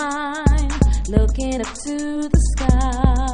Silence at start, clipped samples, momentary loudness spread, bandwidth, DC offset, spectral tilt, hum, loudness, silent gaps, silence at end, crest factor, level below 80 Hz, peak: 0 s; under 0.1%; 7 LU; 10.5 kHz; under 0.1%; -6 dB/octave; none; -20 LUFS; none; 0 s; 16 dB; -20 dBFS; -2 dBFS